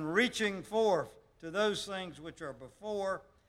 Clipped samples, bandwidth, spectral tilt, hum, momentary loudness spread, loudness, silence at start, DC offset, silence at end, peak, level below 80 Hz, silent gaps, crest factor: under 0.1%; 15 kHz; -4 dB/octave; none; 15 LU; -34 LUFS; 0 s; under 0.1%; 0.25 s; -14 dBFS; -66 dBFS; none; 20 dB